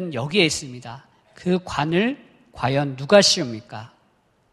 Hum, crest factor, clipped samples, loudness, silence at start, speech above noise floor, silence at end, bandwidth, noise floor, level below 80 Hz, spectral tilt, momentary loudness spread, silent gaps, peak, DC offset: none; 22 dB; under 0.1%; -20 LUFS; 0 s; 41 dB; 0.65 s; 12.5 kHz; -62 dBFS; -54 dBFS; -4 dB/octave; 22 LU; none; 0 dBFS; under 0.1%